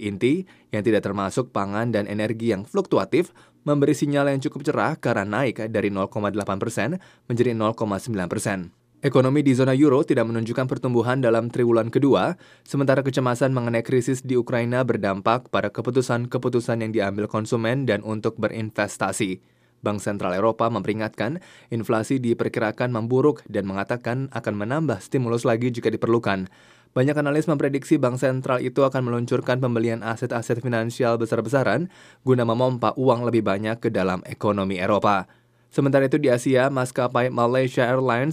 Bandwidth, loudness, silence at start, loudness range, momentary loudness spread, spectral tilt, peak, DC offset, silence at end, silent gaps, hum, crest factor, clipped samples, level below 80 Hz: 15 kHz; -23 LUFS; 0 s; 4 LU; 7 LU; -6.5 dB/octave; -4 dBFS; under 0.1%; 0 s; none; none; 18 dB; under 0.1%; -64 dBFS